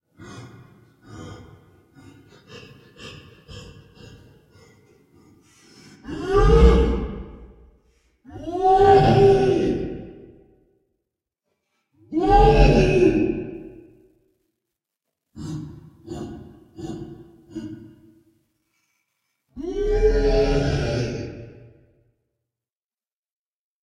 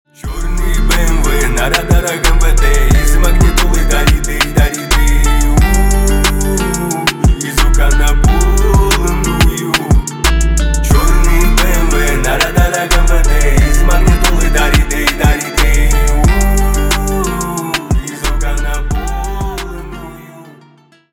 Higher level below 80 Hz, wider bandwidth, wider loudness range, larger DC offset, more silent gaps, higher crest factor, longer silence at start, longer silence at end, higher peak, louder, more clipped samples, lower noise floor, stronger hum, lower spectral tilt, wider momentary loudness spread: second, -30 dBFS vs -12 dBFS; second, 10 kHz vs 17.5 kHz; first, 20 LU vs 4 LU; second, under 0.1% vs 0.5%; neither; first, 22 dB vs 10 dB; about the same, 0.2 s vs 0.25 s; first, 2.45 s vs 0.65 s; about the same, -2 dBFS vs 0 dBFS; second, -19 LUFS vs -13 LUFS; neither; first, under -90 dBFS vs -45 dBFS; neither; first, -7.5 dB/octave vs -4 dB/octave; first, 27 LU vs 7 LU